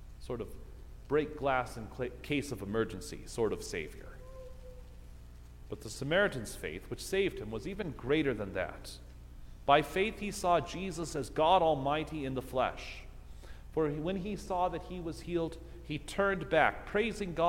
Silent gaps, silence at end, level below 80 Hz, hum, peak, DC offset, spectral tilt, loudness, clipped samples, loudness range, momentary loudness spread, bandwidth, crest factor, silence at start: none; 0 s; -50 dBFS; none; -10 dBFS; under 0.1%; -5 dB/octave; -34 LUFS; under 0.1%; 7 LU; 23 LU; 16.5 kHz; 24 dB; 0 s